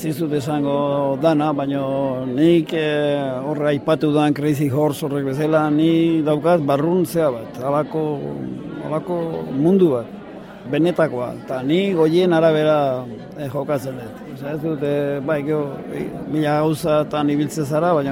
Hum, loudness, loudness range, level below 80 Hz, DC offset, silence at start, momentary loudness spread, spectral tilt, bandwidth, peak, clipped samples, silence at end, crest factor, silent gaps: none; -19 LUFS; 4 LU; -56 dBFS; under 0.1%; 0 s; 12 LU; -7 dB/octave; 16.5 kHz; -4 dBFS; under 0.1%; 0 s; 14 dB; none